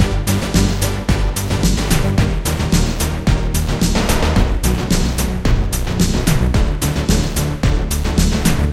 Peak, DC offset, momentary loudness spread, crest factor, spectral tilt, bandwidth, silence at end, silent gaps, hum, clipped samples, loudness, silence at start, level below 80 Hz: 0 dBFS; under 0.1%; 3 LU; 16 dB; -5 dB/octave; 16 kHz; 0 s; none; none; under 0.1%; -17 LUFS; 0 s; -18 dBFS